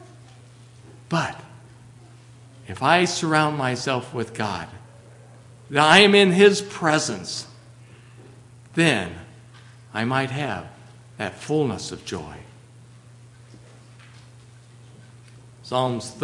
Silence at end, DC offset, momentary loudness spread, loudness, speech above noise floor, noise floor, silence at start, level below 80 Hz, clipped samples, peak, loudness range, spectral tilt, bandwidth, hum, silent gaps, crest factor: 0 s; under 0.1%; 20 LU; -21 LUFS; 27 dB; -48 dBFS; 0 s; -62 dBFS; under 0.1%; 0 dBFS; 13 LU; -4.5 dB/octave; 11.5 kHz; none; none; 24 dB